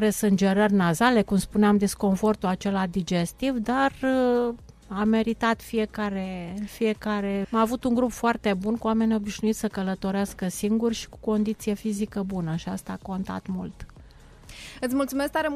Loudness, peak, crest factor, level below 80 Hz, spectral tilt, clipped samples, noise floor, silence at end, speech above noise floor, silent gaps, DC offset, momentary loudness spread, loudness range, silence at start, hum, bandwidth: -25 LUFS; -8 dBFS; 16 dB; -48 dBFS; -6 dB/octave; under 0.1%; -49 dBFS; 0 s; 24 dB; none; under 0.1%; 11 LU; 7 LU; 0 s; none; 15 kHz